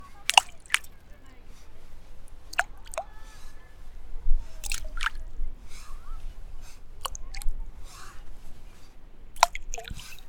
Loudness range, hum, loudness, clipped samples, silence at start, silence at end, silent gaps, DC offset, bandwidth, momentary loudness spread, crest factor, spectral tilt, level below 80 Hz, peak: 11 LU; none; -29 LUFS; under 0.1%; 0 s; 0 s; none; under 0.1%; 18 kHz; 26 LU; 28 dB; -0.5 dB/octave; -34 dBFS; 0 dBFS